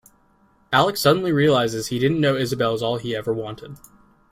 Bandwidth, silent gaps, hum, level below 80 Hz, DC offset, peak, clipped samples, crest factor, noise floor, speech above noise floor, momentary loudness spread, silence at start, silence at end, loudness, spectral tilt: 16 kHz; none; none; -56 dBFS; under 0.1%; -4 dBFS; under 0.1%; 18 dB; -59 dBFS; 38 dB; 10 LU; 0.7 s; 0.55 s; -20 LUFS; -5.5 dB/octave